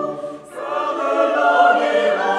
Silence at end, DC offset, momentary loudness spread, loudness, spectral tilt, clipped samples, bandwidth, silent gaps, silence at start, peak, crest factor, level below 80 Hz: 0 s; under 0.1%; 16 LU; -17 LUFS; -4 dB/octave; under 0.1%; 11.5 kHz; none; 0 s; -2 dBFS; 16 dB; -68 dBFS